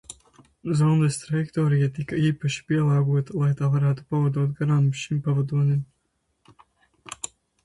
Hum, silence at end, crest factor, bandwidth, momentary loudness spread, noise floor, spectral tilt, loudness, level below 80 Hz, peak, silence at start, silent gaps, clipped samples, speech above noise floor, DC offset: none; 0.4 s; 12 dB; 11.5 kHz; 14 LU; -73 dBFS; -7 dB/octave; -23 LUFS; -58 dBFS; -10 dBFS; 0.1 s; none; under 0.1%; 51 dB; under 0.1%